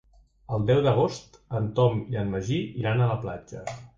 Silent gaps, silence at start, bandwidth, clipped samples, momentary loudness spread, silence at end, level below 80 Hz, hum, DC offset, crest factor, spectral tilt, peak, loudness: none; 0.5 s; 7.6 kHz; under 0.1%; 14 LU; 0.1 s; -50 dBFS; none; under 0.1%; 18 dB; -7.5 dB/octave; -8 dBFS; -26 LUFS